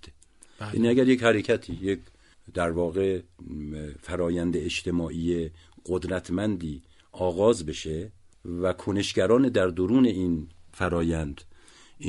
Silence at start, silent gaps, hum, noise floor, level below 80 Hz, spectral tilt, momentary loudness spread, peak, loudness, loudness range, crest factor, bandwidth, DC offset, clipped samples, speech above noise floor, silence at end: 0.05 s; none; none; -54 dBFS; -48 dBFS; -6 dB/octave; 16 LU; -6 dBFS; -26 LUFS; 4 LU; 22 dB; 11.5 kHz; under 0.1%; under 0.1%; 28 dB; 0 s